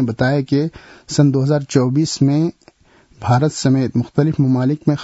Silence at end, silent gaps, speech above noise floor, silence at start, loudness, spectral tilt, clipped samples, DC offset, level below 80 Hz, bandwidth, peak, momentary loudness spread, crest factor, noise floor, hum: 0 s; none; 35 dB; 0 s; -17 LUFS; -6.5 dB/octave; under 0.1%; under 0.1%; -50 dBFS; 8 kHz; -2 dBFS; 4 LU; 14 dB; -51 dBFS; none